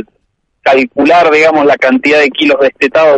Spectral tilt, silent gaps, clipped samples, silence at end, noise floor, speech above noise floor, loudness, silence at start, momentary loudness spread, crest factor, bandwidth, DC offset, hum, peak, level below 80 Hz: -4.5 dB/octave; none; under 0.1%; 0 s; -61 dBFS; 53 dB; -8 LUFS; 0.65 s; 3 LU; 8 dB; 9.2 kHz; under 0.1%; none; 0 dBFS; -52 dBFS